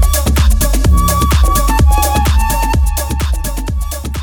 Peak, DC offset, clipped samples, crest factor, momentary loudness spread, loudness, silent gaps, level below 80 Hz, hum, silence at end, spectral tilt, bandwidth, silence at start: -2 dBFS; under 0.1%; under 0.1%; 10 dB; 8 LU; -13 LUFS; none; -12 dBFS; none; 0 s; -4.5 dB/octave; over 20 kHz; 0 s